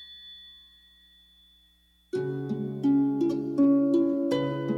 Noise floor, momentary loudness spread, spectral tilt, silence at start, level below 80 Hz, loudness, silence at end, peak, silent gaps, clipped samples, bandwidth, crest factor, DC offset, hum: -63 dBFS; 21 LU; -8 dB/octave; 0 s; -66 dBFS; -26 LUFS; 0 s; -14 dBFS; none; under 0.1%; 7.2 kHz; 14 dB; under 0.1%; 60 Hz at -65 dBFS